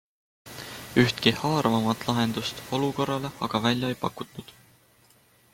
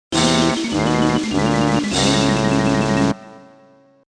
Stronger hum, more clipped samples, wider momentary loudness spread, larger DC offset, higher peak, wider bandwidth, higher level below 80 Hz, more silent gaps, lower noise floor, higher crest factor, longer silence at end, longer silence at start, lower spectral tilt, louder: neither; neither; first, 17 LU vs 3 LU; neither; second, -6 dBFS vs -2 dBFS; first, 17 kHz vs 10.5 kHz; second, -58 dBFS vs -38 dBFS; neither; first, -60 dBFS vs -50 dBFS; first, 22 dB vs 16 dB; first, 1 s vs 0.75 s; first, 0.45 s vs 0.1 s; about the same, -5 dB/octave vs -4.5 dB/octave; second, -26 LUFS vs -17 LUFS